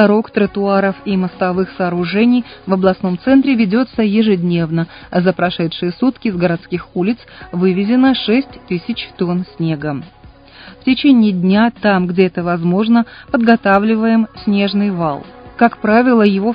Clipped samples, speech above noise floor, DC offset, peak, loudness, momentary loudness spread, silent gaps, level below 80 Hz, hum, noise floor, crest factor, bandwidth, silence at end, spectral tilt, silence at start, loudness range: under 0.1%; 25 dB; under 0.1%; 0 dBFS; -15 LUFS; 9 LU; none; -46 dBFS; none; -39 dBFS; 14 dB; 5.2 kHz; 0 s; -10 dB/octave; 0 s; 4 LU